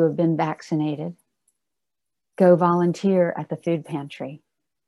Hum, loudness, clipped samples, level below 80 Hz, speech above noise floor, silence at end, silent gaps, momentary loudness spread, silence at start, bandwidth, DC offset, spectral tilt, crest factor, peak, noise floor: none; -22 LUFS; under 0.1%; -72 dBFS; 66 dB; 0.5 s; none; 17 LU; 0 s; 11.5 kHz; under 0.1%; -8.5 dB/octave; 20 dB; -4 dBFS; -87 dBFS